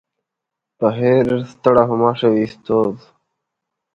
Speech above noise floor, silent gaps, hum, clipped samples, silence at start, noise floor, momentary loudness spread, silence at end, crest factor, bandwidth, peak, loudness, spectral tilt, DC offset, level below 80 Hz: 66 dB; none; none; under 0.1%; 0.8 s; -82 dBFS; 6 LU; 1 s; 18 dB; 7.2 kHz; 0 dBFS; -17 LUFS; -8.5 dB/octave; under 0.1%; -54 dBFS